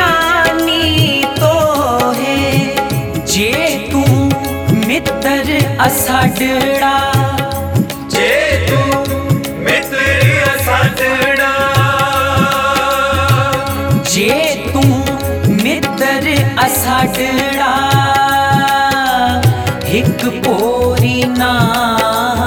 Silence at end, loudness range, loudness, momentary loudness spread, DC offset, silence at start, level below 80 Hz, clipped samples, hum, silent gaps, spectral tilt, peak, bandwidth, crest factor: 0 s; 2 LU; -12 LUFS; 4 LU; under 0.1%; 0 s; -34 dBFS; under 0.1%; none; none; -4.5 dB/octave; 0 dBFS; 19.5 kHz; 12 dB